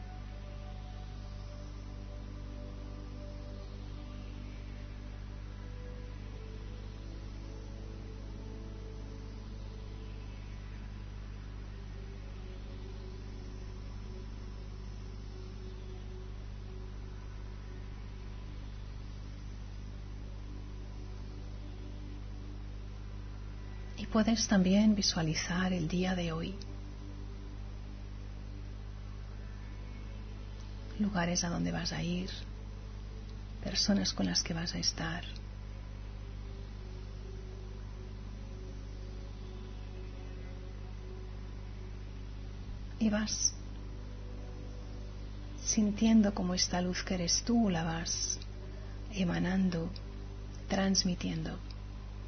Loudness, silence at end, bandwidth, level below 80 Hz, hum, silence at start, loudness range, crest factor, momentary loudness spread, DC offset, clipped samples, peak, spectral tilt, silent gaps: -38 LUFS; 0 s; 6.4 kHz; -44 dBFS; 50 Hz at -45 dBFS; 0 s; 15 LU; 20 dB; 16 LU; under 0.1%; under 0.1%; -16 dBFS; -5 dB/octave; none